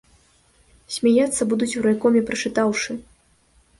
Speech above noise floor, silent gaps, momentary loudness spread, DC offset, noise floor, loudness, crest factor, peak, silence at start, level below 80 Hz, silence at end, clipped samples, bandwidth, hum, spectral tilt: 39 dB; none; 10 LU; under 0.1%; -59 dBFS; -21 LUFS; 16 dB; -6 dBFS; 0.9 s; -56 dBFS; 0.8 s; under 0.1%; 11.5 kHz; none; -4 dB/octave